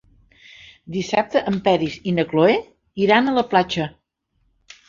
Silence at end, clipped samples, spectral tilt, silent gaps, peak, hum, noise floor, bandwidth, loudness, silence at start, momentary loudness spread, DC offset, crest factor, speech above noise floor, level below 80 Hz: 1 s; under 0.1%; -6 dB/octave; none; -2 dBFS; none; -68 dBFS; 7.6 kHz; -20 LUFS; 0.9 s; 11 LU; under 0.1%; 18 dB; 49 dB; -54 dBFS